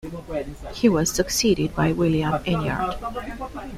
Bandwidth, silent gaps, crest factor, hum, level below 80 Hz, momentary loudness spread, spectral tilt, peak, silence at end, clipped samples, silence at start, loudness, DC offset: 16 kHz; none; 18 dB; none; -40 dBFS; 12 LU; -5 dB/octave; -4 dBFS; 0 s; under 0.1%; 0.05 s; -23 LUFS; under 0.1%